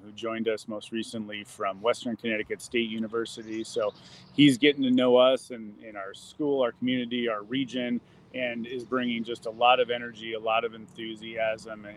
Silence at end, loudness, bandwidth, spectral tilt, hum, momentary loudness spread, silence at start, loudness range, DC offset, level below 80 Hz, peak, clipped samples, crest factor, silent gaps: 0 s; -28 LUFS; 12.5 kHz; -5 dB/octave; none; 16 LU; 0.05 s; 6 LU; under 0.1%; -70 dBFS; -6 dBFS; under 0.1%; 22 dB; none